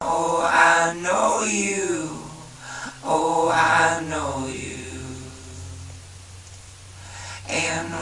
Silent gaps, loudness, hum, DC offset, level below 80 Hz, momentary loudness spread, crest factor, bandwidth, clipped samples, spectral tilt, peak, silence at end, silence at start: none; -21 LUFS; none; under 0.1%; -54 dBFS; 24 LU; 22 dB; 11.5 kHz; under 0.1%; -3 dB/octave; -2 dBFS; 0 s; 0 s